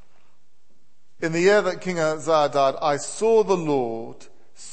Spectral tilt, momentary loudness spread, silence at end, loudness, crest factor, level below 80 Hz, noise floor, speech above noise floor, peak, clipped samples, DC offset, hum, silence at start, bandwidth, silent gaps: -4.5 dB/octave; 11 LU; 0 s; -22 LUFS; 16 dB; -66 dBFS; -68 dBFS; 47 dB; -6 dBFS; under 0.1%; 1%; none; 1.2 s; 8.8 kHz; none